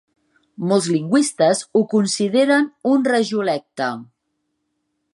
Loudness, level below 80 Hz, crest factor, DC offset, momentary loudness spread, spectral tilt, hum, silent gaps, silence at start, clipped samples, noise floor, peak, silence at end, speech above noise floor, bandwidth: -18 LUFS; -72 dBFS; 16 dB; under 0.1%; 9 LU; -4.5 dB/octave; none; none; 0.6 s; under 0.1%; -73 dBFS; -2 dBFS; 1.1 s; 55 dB; 11.5 kHz